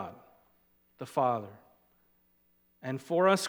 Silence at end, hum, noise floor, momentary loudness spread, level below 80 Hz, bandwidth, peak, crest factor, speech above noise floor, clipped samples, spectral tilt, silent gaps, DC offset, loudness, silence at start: 0 s; 60 Hz at -70 dBFS; -70 dBFS; 19 LU; -80 dBFS; 19 kHz; -10 dBFS; 24 dB; 40 dB; under 0.1%; -5 dB/octave; none; under 0.1%; -32 LUFS; 0 s